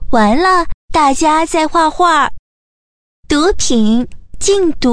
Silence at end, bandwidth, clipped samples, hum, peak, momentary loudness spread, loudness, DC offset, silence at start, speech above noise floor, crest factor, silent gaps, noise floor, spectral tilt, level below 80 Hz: 0 s; 11 kHz; under 0.1%; none; -2 dBFS; 7 LU; -12 LUFS; under 0.1%; 0 s; over 79 dB; 12 dB; 0.74-0.88 s, 2.39-3.23 s; under -90 dBFS; -3.5 dB/octave; -30 dBFS